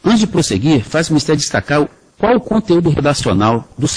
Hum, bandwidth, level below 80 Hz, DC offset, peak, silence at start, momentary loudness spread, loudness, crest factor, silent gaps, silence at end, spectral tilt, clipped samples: none; 10.5 kHz; -40 dBFS; under 0.1%; 0 dBFS; 0.05 s; 4 LU; -14 LUFS; 14 dB; none; 0 s; -5 dB/octave; under 0.1%